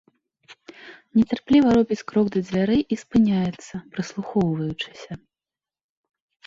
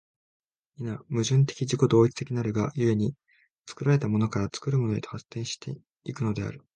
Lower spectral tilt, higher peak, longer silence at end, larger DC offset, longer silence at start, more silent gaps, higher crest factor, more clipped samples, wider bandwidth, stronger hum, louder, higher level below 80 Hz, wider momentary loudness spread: about the same, -7 dB/octave vs -6.5 dB/octave; about the same, -6 dBFS vs -8 dBFS; first, 1.3 s vs 0.2 s; neither; second, 0.5 s vs 0.8 s; second, none vs 3.50-3.64 s; about the same, 16 dB vs 18 dB; neither; second, 7.6 kHz vs 9.8 kHz; neither; first, -22 LUFS vs -27 LUFS; about the same, -52 dBFS vs -56 dBFS; first, 19 LU vs 14 LU